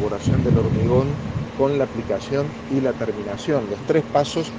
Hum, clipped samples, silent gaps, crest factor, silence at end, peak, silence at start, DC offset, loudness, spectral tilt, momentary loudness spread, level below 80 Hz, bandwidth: none; under 0.1%; none; 16 dB; 0 s; -4 dBFS; 0 s; under 0.1%; -22 LUFS; -7 dB/octave; 7 LU; -40 dBFS; 9.6 kHz